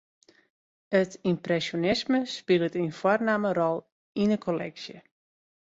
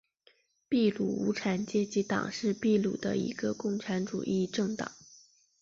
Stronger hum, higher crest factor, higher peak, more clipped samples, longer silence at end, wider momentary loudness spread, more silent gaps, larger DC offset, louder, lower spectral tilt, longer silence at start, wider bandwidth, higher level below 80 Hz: neither; about the same, 18 dB vs 16 dB; first, -10 dBFS vs -16 dBFS; neither; first, 0.6 s vs 0.45 s; first, 10 LU vs 6 LU; first, 3.92-4.15 s vs none; neither; first, -27 LUFS vs -31 LUFS; about the same, -6 dB/octave vs -5.5 dB/octave; first, 0.9 s vs 0.7 s; about the same, 8 kHz vs 7.6 kHz; about the same, -64 dBFS vs -68 dBFS